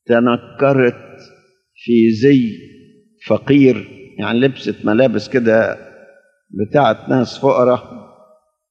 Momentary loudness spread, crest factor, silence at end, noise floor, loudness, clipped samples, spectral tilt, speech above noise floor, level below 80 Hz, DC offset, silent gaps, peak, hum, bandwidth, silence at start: 13 LU; 16 dB; 0.7 s; -52 dBFS; -15 LUFS; under 0.1%; -7.5 dB/octave; 38 dB; -60 dBFS; under 0.1%; none; 0 dBFS; none; 7.4 kHz; 0.1 s